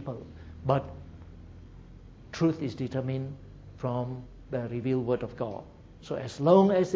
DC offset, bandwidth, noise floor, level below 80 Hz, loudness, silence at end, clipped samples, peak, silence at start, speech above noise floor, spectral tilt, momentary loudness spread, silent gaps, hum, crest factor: under 0.1%; 8 kHz; -49 dBFS; -52 dBFS; -29 LUFS; 0 s; under 0.1%; -8 dBFS; 0 s; 21 dB; -8 dB/octave; 26 LU; none; none; 22 dB